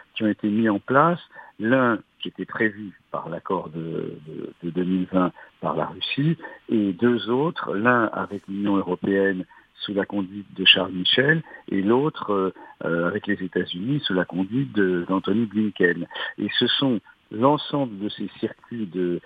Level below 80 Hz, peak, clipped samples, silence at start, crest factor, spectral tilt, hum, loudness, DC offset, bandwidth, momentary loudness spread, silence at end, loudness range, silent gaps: -66 dBFS; -2 dBFS; under 0.1%; 0.15 s; 22 dB; -8 dB/octave; none; -23 LUFS; under 0.1%; 5 kHz; 12 LU; 0.05 s; 6 LU; none